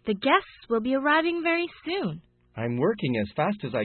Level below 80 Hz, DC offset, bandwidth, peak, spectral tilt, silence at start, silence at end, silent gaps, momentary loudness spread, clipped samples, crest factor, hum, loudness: -62 dBFS; under 0.1%; 4.4 kHz; -6 dBFS; -10.5 dB/octave; 0.05 s; 0 s; none; 10 LU; under 0.1%; 20 dB; none; -26 LUFS